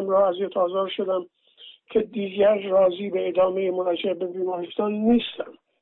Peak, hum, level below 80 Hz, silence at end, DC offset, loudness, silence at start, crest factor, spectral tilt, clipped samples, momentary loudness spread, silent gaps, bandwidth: -10 dBFS; none; -64 dBFS; 0.3 s; under 0.1%; -24 LUFS; 0 s; 12 dB; -9.5 dB/octave; under 0.1%; 8 LU; none; 4.1 kHz